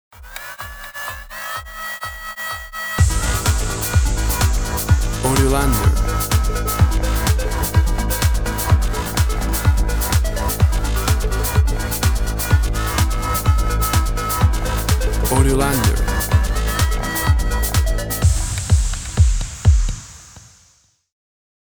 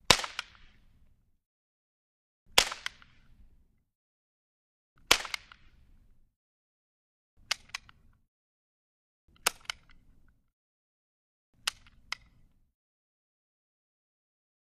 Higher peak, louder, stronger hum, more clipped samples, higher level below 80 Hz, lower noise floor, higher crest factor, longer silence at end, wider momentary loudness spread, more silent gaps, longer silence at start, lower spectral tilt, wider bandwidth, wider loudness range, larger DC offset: about the same, 0 dBFS vs -2 dBFS; first, -19 LUFS vs -31 LUFS; neither; neither; first, -20 dBFS vs -58 dBFS; second, -56 dBFS vs -64 dBFS; second, 16 dB vs 36 dB; second, 1.25 s vs 3.05 s; second, 10 LU vs 16 LU; second, none vs 1.46-2.46 s, 3.95-4.96 s, 6.36-7.37 s, 8.28-9.28 s, 10.53-11.53 s; about the same, 0.2 s vs 0.1 s; first, -4.5 dB/octave vs -0.5 dB/octave; first, over 20 kHz vs 14.5 kHz; second, 3 LU vs 10 LU; neither